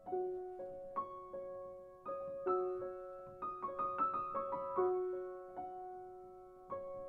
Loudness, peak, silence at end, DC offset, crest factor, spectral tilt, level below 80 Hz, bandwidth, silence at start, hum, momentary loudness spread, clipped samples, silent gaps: -42 LUFS; -24 dBFS; 0 s; under 0.1%; 18 dB; -9 dB/octave; -72 dBFS; 4 kHz; 0 s; none; 14 LU; under 0.1%; none